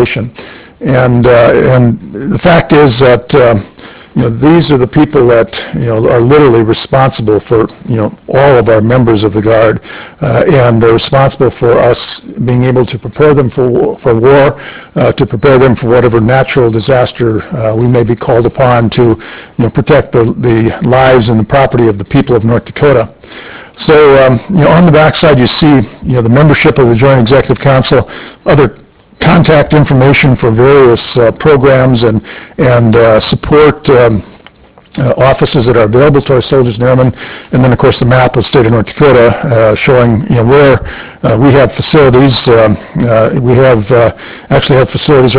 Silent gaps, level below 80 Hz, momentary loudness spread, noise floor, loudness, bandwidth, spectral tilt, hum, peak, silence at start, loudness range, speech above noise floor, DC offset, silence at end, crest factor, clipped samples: none; -30 dBFS; 8 LU; -38 dBFS; -7 LUFS; 4 kHz; -11.5 dB/octave; none; 0 dBFS; 0 s; 2 LU; 31 dB; 0.2%; 0 s; 6 dB; 5%